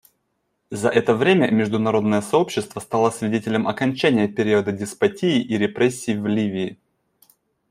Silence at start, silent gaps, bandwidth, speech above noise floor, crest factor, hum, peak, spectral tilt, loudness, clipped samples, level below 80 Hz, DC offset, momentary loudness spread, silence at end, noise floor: 0.7 s; none; 15 kHz; 52 dB; 18 dB; none; -4 dBFS; -5.5 dB/octave; -20 LUFS; under 0.1%; -62 dBFS; under 0.1%; 7 LU; 0.95 s; -72 dBFS